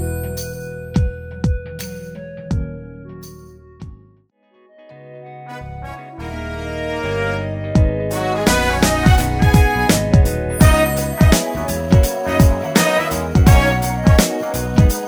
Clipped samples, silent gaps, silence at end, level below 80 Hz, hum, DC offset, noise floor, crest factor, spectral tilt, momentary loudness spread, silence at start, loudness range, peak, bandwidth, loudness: under 0.1%; none; 0 s; -22 dBFS; none; under 0.1%; -55 dBFS; 16 dB; -5.5 dB/octave; 19 LU; 0 s; 17 LU; 0 dBFS; over 20 kHz; -16 LUFS